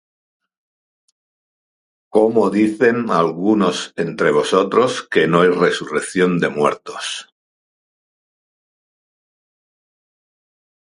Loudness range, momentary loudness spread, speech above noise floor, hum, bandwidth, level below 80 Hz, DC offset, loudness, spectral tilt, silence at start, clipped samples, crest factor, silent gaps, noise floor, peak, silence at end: 9 LU; 9 LU; over 74 dB; none; 11.5 kHz; -64 dBFS; under 0.1%; -17 LUFS; -5 dB/octave; 2.15 s; under 0.1%; 20 dB; none; under -90 dBFS; 0 dBFS; 3.75 s